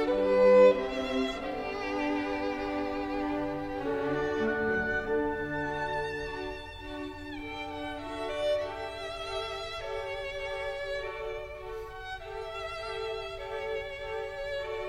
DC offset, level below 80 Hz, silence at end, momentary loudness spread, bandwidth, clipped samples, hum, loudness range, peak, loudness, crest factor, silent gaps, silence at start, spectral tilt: under 0.1%; -50 dBFS; 0 s; 11 LU; 11 kHz; under 0.1%; none; 8 LU; -10 dBFS; -32 LUFS; 20 dB; none; 0 s; -5.5 dB/octave